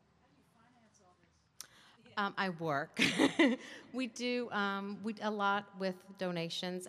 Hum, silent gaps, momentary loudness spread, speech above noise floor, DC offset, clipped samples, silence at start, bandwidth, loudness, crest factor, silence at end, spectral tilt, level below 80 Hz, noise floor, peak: none; none; 14 LU; 35 dB; under 0.1%; under 0.1%; 2.05 s; 15.5 kHz; -35 LUFS; 22 dB; 0 s; -4.5 dB/octave; -80 dBFS; -70 dBFS; -16 dBFS